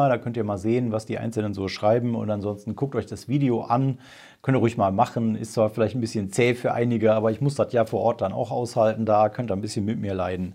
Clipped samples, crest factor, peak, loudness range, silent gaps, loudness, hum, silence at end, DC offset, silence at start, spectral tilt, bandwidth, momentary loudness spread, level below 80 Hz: under 0.1%; 16 dB; -6 dBFS; 3 LU; none; -24 LUFS; none; 0 s; under 0.1%; 0 s; -7 dB/octave; 15 kHz; 7 LU; -64 dBFS